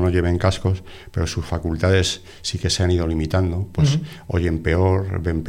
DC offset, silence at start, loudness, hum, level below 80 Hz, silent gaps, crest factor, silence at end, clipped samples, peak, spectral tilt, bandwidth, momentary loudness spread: under 0.1%; 0 s; -21 LUFS; none; -34 dBFS; none; 16 dB; 0 s; under 0.1%; -4 dBFS; -5.5 dB/octave; 12 kHz; 7 LU